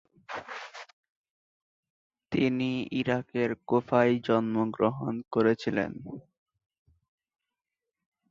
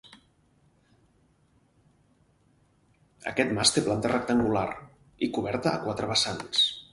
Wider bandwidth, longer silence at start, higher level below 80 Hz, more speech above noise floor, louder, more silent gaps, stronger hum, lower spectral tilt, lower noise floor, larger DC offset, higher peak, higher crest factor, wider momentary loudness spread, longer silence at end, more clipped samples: second, 7.4 kHz vs 11.5 kHz; first, 0.3 s vs 0.05 s; second, -66 dBFS vs -58 dBFS; first, 61 dB vs 39 dB; about the same, -28 LUFS vs -26 LUFS; first, 0.93-1.03 s, 1.10-1.24 s, 1.30-1.83 s, 1.90-2.10 s vs none; neither; first, -7.5 dB/octave vs -3.5 dB/octave; first, -89 dBFS vs -65 dBFS; neither; about the same, -8 dBFS vs -6 dBFS; about the same, 22 dB vs 24 dB; first, 17 LU vs 10 LU; first, 2.1 s vs 0.1 s; neither